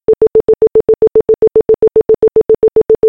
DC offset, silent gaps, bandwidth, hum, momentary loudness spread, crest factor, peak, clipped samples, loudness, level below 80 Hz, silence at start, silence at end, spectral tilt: under 0.1%; none; 2.6 kHz; none; 0 LU; 8 dB; -2 dBFS; under 0.1%; -10 LUFS; -38 dBFS; 0.1 s; 0 s; -10 dB/octave